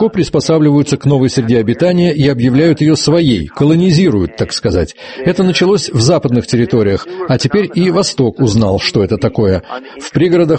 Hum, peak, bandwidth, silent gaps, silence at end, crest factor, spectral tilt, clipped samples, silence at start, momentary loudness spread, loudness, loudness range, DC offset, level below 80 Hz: none; 0 dBFS; 8.8 kHz; none; 0 s; 12 dB; -6 dB/octave; under 0.1%; 0 s; 6 LU; -12 LUFS; 2 LU; under 0.1%; -36 dBFS